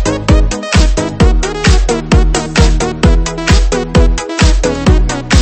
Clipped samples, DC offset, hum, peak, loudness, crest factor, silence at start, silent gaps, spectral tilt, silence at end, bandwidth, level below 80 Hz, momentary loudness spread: 0.5%; under 0.1%; none; 0 dBFS; -12 LUFS; 10 dB; 0 s; none; -5 dB/octave; 0 s; 8.8 kHz; -12 dBFS; 2 LU